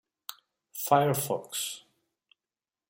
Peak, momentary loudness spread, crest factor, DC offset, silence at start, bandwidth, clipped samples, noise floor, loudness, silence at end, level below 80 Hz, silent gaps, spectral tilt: -8 dBFS; 20 LU; 24 dB; under 0.1%; 0.3 s; 16.5 kHz; under 0.1%; under -90 dBFS; -28 LUFS; 1.1 s; -74 dBFS; none; -4 dB/octave